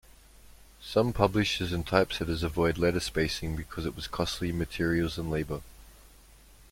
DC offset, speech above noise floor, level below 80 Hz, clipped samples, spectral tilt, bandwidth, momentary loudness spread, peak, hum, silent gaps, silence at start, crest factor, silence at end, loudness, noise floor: under 0.1%; 26 dB; -46 dBFS; under 0.1%; -5.5 dB/octave; 16.5 kHz; 9 LU; -6 dBFS; none; none; 0.45 s; 24 dB; 0.1 s; -29 LUFS; -55 dBFS